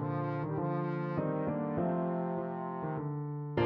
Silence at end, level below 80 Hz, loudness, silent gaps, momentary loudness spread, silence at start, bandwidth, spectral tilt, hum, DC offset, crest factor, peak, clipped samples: 0 s; -66 dBFS; -35 LUFS; none; 5 LU; 0 s; 5 kHz; -8 dB/octave; none; under 0.1%; 16 dB; -18 dBFS; under 0.1%